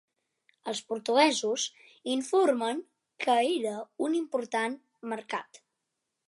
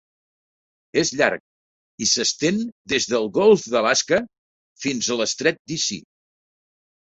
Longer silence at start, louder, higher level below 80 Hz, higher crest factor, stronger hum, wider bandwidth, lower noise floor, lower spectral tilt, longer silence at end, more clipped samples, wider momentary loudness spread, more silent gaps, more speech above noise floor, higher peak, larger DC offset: second, 0.65 s vs 0.95 s; second, -29 LUFS vs -21 LUFS; second, -86 dBFS vs -62 dBFS; about the same, 20 dB vs 22 dB; neither; first, 11.5 kHz vs 8.2 kHz; second, -84 dBFS vs under -90 dBFS; about the same, -2.5 dB/octave vs -2.5 dB/octave; second, 0.85 s vs 1.2 s; neither; first, 14 LU vs 10 LU; second, none vs 1.40-1.98 s, 2.72-2.85 s, 4.38-4.75 s, 5.59-5.65 s; second, 55 dB vs over 69 dB; second, -10 dBFS vs -2 dBFS; neither